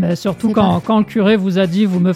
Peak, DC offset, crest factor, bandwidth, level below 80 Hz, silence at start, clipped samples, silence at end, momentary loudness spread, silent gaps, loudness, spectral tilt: -2 dBFS; under 0.1%; 12 dB; 13.5 kHz; -46 dBFS; 0 s; under 0.1%; 0 s; 3 LU; none; -15 LUFS; -7.5 dB/octave